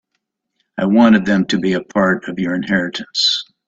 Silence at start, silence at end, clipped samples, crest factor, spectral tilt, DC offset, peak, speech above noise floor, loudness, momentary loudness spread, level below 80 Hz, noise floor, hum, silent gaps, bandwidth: 0.75 s; 0.25 s; under 0.1%; 16 dB; -5 dB/octave; under 0.1%; 0 dBFS; 58 dB; -16 LUFS; 10 LU; -54 dBFS; -74 dBFS; none; none; 7.8 kHz